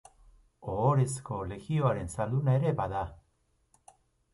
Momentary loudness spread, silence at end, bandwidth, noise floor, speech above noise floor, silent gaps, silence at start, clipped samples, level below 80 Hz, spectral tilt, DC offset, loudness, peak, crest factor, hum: 11 LU; 1.2 s; 11.5 kHz; -72 dBFS; 43 dB; none; 0.6 s; under 0.1%; -52 dBFS; -7.5 dB/octave; under 0.1%; -30 LUFS; -12 dBFS; 18 dB; none